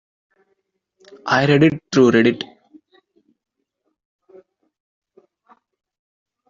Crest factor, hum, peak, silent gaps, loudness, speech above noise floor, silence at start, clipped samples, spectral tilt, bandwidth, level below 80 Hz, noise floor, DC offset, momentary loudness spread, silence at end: 20 dB; none; -2 dBFS; none; -16 LUFS; 58 dB; 1.25 s; under 0.1%; -5 dB/octave; 7.6 kHz; -60 dBFS; -74 dBFS; under 0.1%; 18 LU; 4.05 s